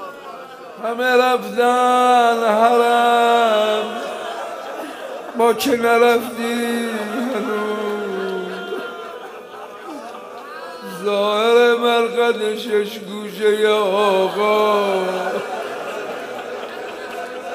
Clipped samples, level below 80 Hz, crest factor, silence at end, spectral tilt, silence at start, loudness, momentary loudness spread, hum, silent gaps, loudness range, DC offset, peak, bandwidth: under 0.1%; -68 dBFS; 16 dB; 0 s; -3.5 dB/octave; 0 s; -18 LUFS; 18 LU; none; none; 10 LU; under 0.1%; -2 dBFS; 15.5 kHz